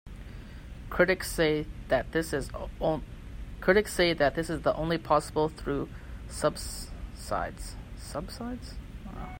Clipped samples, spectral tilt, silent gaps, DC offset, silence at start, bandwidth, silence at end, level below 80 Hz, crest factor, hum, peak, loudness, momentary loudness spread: under 0.1%; -5 dB/octave; none; under 0.1%; 0.05 s; 16.5 kHz; 0 s; -42 dBFS; 22 dB; none; -8 dBFS; -29 LUFS; 19 LU